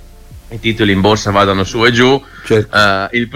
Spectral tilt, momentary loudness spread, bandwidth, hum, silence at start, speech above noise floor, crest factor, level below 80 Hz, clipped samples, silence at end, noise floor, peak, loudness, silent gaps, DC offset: -5 dB/octave; 8 LU; 16 kHz; none; 0 s; 23 dB; 12 dB; -36 dBFS; under 0.1%; 0 s; -35 dBFS; 0 dBFS; -12 LUFS; none; under 0.1%